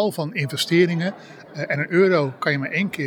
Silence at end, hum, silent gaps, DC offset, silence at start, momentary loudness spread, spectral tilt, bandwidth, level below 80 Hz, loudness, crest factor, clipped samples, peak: 0 s; none; none; under 0.1%; 0 s; 12 LU; -5.5 dB/octave; 20 kHz; -74 dBFS; -21 LUFS; 16 dB; under 0.1%; -4 dBFS